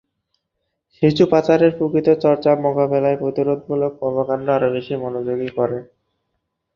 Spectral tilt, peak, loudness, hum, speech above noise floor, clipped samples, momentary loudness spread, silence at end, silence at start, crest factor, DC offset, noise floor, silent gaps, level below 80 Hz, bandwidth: -8 dB/octave; -2 dBFS; -18 LUFS; none; 58 dB; under 0.1%; 9 LU; 0.9 s; 1 s; 16 dB; under 0.1%; -75 dBFS; none; -56 dBFS; 7 kHz